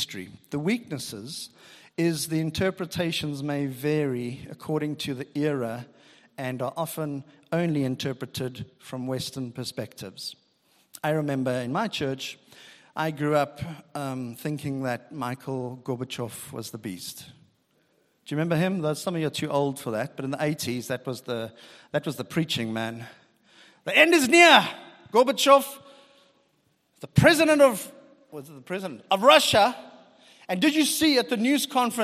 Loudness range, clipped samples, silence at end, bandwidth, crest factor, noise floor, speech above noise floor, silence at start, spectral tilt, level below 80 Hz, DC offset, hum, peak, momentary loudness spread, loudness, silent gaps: 12 LU; under 0.1%; 0 s; 15.5 kHz; 26 dB; -69 dBFS; 43 dB; 0 s; -4.5 dB/octave; -62 dBFS; under 0.1%; none; 0 dBFS; 19 LU; -25 LUFS; none